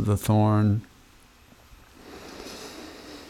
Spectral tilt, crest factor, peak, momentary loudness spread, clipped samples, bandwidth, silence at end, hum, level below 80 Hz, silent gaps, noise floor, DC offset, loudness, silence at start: -7 dB/octave; 18 dB; -10 dBFS; 22 LU; under 0.1%; 15.5 kHz; 0.05 s; none; -52 dBFS; none; -54 dBFS; under 0.1%; -23 LUFS; 0 s